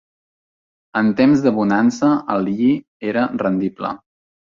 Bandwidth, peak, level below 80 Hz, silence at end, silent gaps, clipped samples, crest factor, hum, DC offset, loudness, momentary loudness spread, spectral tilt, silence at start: 7.4 kHz; -2 dBFS; -58 dBFS; 0.55 s; 2.88-3.00 s; under 0.1%; 16 dB; none; under 0.1%; -18 LUFS; 11 LU; -7 dB/octave; 0.95 s